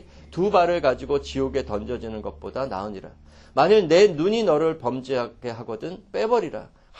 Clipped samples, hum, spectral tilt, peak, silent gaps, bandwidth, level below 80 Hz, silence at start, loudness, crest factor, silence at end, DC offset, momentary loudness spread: under 0.1%; none; -5.5 dB/octave; -4 dBFS; none; 8.2 kHz; -46 dBFS; 0.15 s; -23 LUFS; 18 dB; 0.3 s; under 0.1%; 16 LU